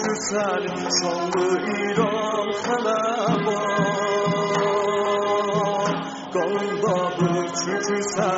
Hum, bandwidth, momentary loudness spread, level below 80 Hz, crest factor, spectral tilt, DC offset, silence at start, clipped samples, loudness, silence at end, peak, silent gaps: none; 8 kHz; 3 LU; -64 dBFS; 16 dB; -4 dB/octave; under 0.1%; 0 s; under 0.1%; -23 LUFS; 0 s; -6 dBFS; none